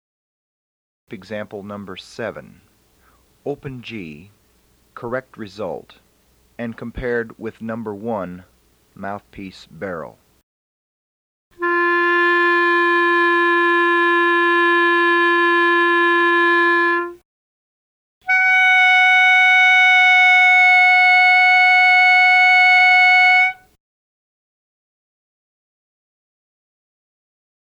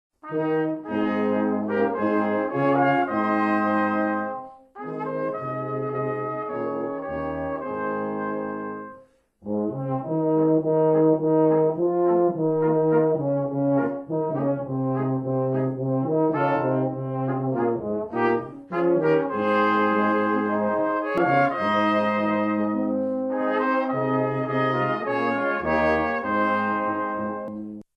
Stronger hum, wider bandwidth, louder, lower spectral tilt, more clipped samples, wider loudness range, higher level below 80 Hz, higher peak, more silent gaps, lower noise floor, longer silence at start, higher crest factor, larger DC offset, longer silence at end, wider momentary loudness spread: neither; first, 11 kHz vs 6 kHz; first, -12 LUFS vs -24 LUFS; second, -3.5 dB/octave vs -9 dB/octave; neither; first, 23 LU vs 7 LU; about the same, -54 dBFS vs -58 dBFS; first, -6 dBFS vs -10 dBFS; first, 10.43-11.51 s, 17.25-18.21 s vs none; first, -58 dBFS vs -53 dBFS; first, 1.1 s vs 0.25 s; about the same, 12 dB vs 14 dB; neither; first, 4.15 s vs 0.15 s; first, 22 LU vs 9 LU